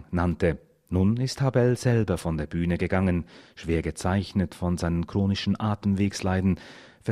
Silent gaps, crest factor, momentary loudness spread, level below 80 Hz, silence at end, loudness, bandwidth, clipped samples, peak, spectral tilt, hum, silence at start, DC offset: none; 18 dB; 7 LU; -44 dBFS; 0 s; -26 LUFS; 13.5 kHz; under 0.1%; -8 dBFS; -7 dB/octave; none; 0 s; under 0.1%